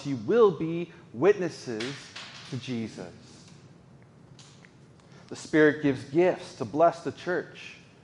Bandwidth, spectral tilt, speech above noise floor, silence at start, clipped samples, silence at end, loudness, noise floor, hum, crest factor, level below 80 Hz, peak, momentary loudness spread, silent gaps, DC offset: 11 kHz; -6 dB/octave; 27 dB; 0 s; under 0.1%; 0.3 s; -27 LUFS; -54 dBFS; none; 20 dB; -68 dBFS; -8 dBFS; 20 LU; none; under 0.1%